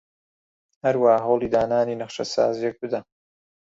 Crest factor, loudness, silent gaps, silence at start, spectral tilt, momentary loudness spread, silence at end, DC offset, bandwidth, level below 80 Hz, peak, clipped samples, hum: 20 dB; -23 LUFS; none; 0.85 s; -5.5 dB/octave; 11 LU; 0.75 s; under 0.1%; 7.8 kHz; -60 dBFS; -4 dBFS; under 0.1%; none